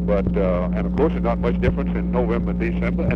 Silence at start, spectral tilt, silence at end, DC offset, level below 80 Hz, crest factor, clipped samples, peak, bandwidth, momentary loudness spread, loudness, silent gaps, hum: 0 s; -10 dB/octave; 0 s; under 0.1%; -28 dBFS; 14 dB; under 0.1%; -6 dBFS; 5.4 kHz; 2 LU; -21 LUFS; none; none